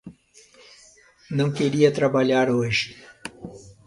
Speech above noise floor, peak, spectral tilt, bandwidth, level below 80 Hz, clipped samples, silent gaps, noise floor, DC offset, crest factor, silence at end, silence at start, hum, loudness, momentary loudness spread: 33 dB; -4 dBFS; -6 dB/octave; 11.5 kHz; -58 dBFS; under 0.1%; none; -53 dBFS; under 0.1%; 20 dB; 0.15 s; 0.05 s; none; -22 LUFS; 20 LU